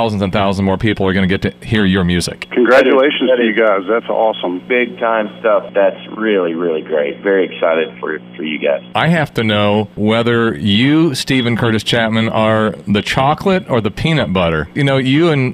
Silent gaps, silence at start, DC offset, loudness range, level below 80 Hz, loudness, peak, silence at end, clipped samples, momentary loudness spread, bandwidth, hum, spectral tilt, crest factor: none; 0 s; under 0.1%; 3 LU; -42 dBFS; -14 LUFS; 0 dBFS; 0 s; under 0.1%; 5 LU; 15 kHz; none; -6 dB/octave; 14 dB